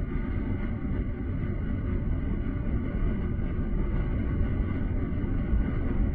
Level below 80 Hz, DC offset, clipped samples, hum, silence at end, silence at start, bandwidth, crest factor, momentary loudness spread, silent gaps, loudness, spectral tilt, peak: -30 dBFS; under 0.1%; under 0.1%; none; 0 s; 0 s; 3.6 kHz; 14 dB; 3 LU; none; -31 LUFS; -12 dB/octave; -14 dBFS